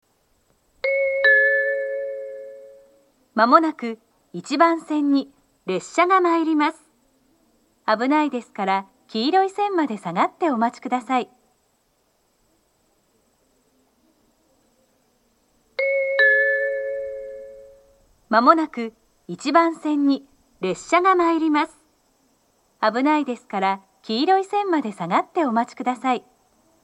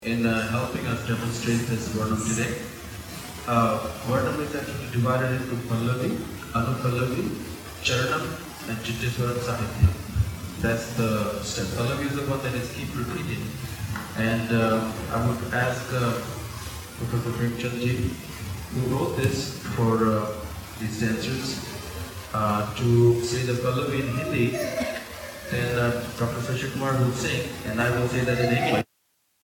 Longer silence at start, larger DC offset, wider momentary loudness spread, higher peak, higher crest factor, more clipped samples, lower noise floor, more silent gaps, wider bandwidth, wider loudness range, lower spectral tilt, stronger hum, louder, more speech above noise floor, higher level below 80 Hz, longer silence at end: first, 0.85 s vs 0 s; neither; first, 16 LU vs 11 LU; first, -2 dBFS vs -6 dBFS; about the same, 22 dB vs 20 dB; neither; second, -66 dBFS vs -70 dBFS; neither; second, 11.5 kHz vs 18 kHz; about the same, 5 LU vs 3 LU; about the same, -4.5 dB/octave vs -5.5 dB/octave; neither; first, -21 LUFS vs -26 LUFS; about the same, 46 dB vs 45 dB; second, -68 dBFS vs -46 dBFS; about the same, 0.65 s vs 0.6 s